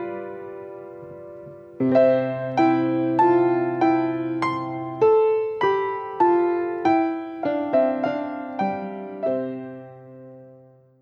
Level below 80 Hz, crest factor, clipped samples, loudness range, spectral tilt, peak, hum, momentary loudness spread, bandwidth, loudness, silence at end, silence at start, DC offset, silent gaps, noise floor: -70 dBFS; 16 dB; under 0.1%; 6 LU; -8 dB/octave; -8 dBFS; none; 20 LU; 6.8 kHz; -22 LUFS; 0.5 s; 0 s; under 0.1%; none; -51 dBFS